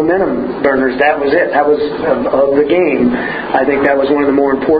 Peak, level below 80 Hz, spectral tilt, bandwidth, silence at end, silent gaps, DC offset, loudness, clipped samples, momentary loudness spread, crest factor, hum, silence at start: 0 dBFS; -44 dBFS; -9.5 dB/octave; 5 kHz; 0 s; none; under 0.1%; -12 LUFS; under 0.1%; 4 LU; 12 dB; none; 0 s